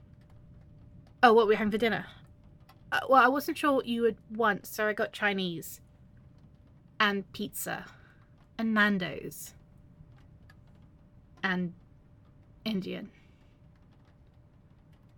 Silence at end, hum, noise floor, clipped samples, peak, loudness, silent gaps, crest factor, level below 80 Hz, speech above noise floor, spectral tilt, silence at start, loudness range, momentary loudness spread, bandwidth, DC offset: 2.1 s; none; -58 dBFS; under 0.1%; -6 dBFS; -28 LUFS; none; 24 dB; -62 dBFS; 30 dB; -4.5 dB/octave; 0.5 s; 12 LU; 20 LU; 17.5 kHz; under 0.1%